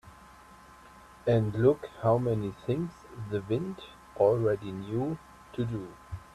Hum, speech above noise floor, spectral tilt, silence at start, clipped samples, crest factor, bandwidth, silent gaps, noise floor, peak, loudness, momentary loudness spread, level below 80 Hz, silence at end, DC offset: none; 24 dB; -8.5 dB/octave; 0.05 s; under 0.1%; 20 dB; 12.5 kHz; none; -53 dBFS; -12 dBFS; -30 LUFS; 17 LU; -56 dBFS; 0.1 s; under 0.1%